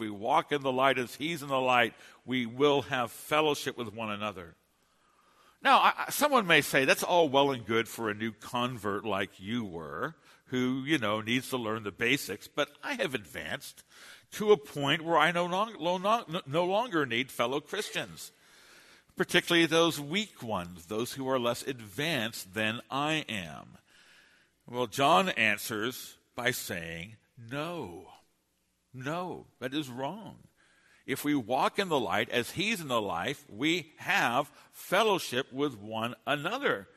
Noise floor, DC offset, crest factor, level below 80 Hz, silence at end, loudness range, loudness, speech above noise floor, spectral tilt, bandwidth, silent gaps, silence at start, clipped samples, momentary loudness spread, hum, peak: -75 dBFS; under 0.1%; 24 dB; -70 dBFS; 0.1 s; 7 LU; -30 LUFS; 45 dB; -4 dB/octave; 13.5 kHz; none; 0 s; under 0.1%; 13 LU; none; -8 dBFS